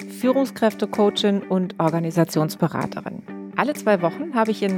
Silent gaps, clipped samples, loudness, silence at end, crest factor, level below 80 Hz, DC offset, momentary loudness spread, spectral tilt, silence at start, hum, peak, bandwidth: none; under 0.1%; -22 LUFS; 0 s; 18 dB; -66 dBFS; under 0.1%; 9 LU; -6 dB/octave; 0 s; none; -2 dBFS; 18 kHz